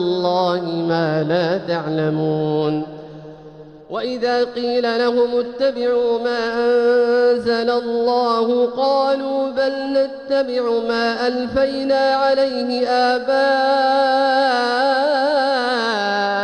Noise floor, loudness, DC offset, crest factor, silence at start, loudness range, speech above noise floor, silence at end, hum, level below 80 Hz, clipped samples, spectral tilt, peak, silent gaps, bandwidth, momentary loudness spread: -39 dBFS; -18 LUFS; under 0.1%; 12 dB; 0 s; 5 LU; 22 dB; 0 s; none; -54 dBFS; under 0.1%; -6 dB/octave; -6 dBFS; none; 9.8 kHz; 5 LU